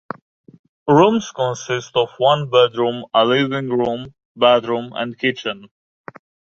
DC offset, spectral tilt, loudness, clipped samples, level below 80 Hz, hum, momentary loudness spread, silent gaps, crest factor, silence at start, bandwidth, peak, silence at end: under 0.1%; -5.5 dB/octave; -18 LUFS; under 0.1%; -60 dBFS; none; 15 LU; 4.25-4.35 s; 18 dB; 0.85 s; 7.6 kHz; 0 dBFS; 0.85 s